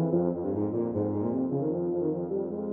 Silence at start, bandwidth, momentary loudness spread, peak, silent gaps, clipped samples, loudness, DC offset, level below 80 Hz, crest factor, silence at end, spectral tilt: 0 s; 2.3 kHz; 3 LU; -14 dBFS; none; under 0.1%; -30 LUFS; under 0.1%; -64 dBFS; 16 dB; 0 s; -14 dB/octave